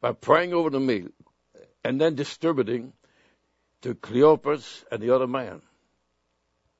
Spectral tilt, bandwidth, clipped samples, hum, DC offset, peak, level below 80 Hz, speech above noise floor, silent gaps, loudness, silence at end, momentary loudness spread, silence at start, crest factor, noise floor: -6.5 dB/octave; 8 kHz; under 0.1%; none; under 0.1%; -4 dBFS; -70 dBFS; 50 dB; none; -24 LUFS; 1.2 s; 16 LU; 0 s; 22 dB; -74 dBFS